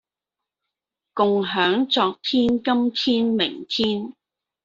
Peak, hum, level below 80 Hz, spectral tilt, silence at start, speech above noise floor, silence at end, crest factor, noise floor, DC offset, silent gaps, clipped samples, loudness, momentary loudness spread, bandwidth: -4 dBFS; none; -60 dBFS; -5.5 dB/octave; 1.15 s; 66 dB; 0.55 s; 18 dB; -87 dBFS; under 0.1%; none; under 0.1%; -21 LUFS; 4 LU; 7.6 kHz